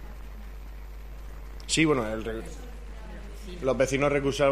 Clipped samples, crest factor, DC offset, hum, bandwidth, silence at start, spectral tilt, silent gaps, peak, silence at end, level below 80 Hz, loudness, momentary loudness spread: under 0.1%; 20 dB; under 0.1%; none; 15 kHz; 0 s; -4.5 dB/octave; none; -10 dBFS; 0 s; -40 dBFS; -26 LUFS; 20 LU